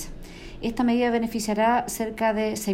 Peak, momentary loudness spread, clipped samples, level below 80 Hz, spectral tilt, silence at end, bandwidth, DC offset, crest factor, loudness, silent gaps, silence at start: -10 dBFS; 15 LU; under 0.1%; -44 dBFS; -4.5 dB/octave; 0 s; 16 kHz; under 0.1%; 16 dB; -24 LUFS; none; 0 s